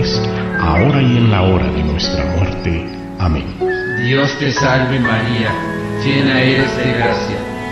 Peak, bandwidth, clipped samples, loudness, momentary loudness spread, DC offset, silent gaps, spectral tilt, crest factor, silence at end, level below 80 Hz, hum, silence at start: 0 dBFS; 11.5 kHz; under 0.1%; -15 LUFS; 8 LU; under 0.1%; none; -6.5 dB/octave; 14 dB; 0 s; -28 dBFS; none; 0 s